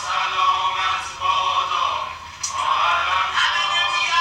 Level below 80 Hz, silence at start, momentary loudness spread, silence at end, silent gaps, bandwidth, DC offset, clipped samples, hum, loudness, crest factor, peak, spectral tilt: -56 dBFS; 0 s; 6 LU; 0 s; none; 15.5 kHz; under 0.1%; under 0.1%; none; -20 LUFS; 16 dB; -6 dBFS; 0.5 dB/octave